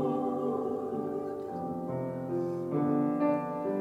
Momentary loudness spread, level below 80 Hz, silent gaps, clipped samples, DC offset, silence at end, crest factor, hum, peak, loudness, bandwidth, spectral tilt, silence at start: 8 LU; -72 dBFS; none; under 0.1%; under 0.1%; 0 s; 14 dB; none; -18 dBFS; -32 LUFS; 7.8 kHz; -9.5 dB/octave; 0 s